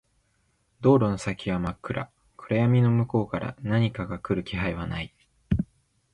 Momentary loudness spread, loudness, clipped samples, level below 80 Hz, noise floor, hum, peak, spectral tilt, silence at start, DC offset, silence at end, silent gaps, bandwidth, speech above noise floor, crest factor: 13 LU; -26 LUFS; under 0.1%; -46 dBFS; -69 dBFS; none; -8 dBFS; -8 dB/octave; 0.8 s; under 0.1%; 0.5 s; none; 10 kHz; 45 dB; 18 dB